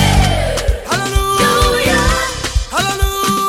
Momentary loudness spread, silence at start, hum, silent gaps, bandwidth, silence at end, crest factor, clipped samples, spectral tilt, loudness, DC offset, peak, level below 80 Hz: 6 LU; 0 s; none; none; 16.5 kHz; 0 s; 12 dB; under 0.1%; -4 dB/octave; -14 LUFS; under 0.1%; -2 dBFS; -20 dBFS